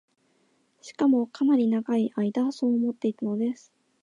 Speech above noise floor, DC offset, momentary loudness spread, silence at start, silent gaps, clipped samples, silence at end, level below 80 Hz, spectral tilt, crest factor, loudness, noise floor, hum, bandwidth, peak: 43 dB; under 0.1%; 7 LU; 0.85 s; none; under 0.1%; 0.5 s; -80 dBFS; -7 dB/octave; 12 dB; -26 LUFS; -68 dBFS; none; 9.4 kHz; -14 dBFS